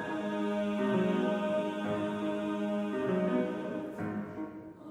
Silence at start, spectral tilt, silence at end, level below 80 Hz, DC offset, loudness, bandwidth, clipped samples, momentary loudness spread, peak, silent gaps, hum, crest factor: 0 s; -7.5 dB/octave; 0 s; -70 dBFS; under 0.1%; -33 LUFS; 10.5 kHz; under 0.1%; 8 LU; -18 dBFS; none; none; 14 dB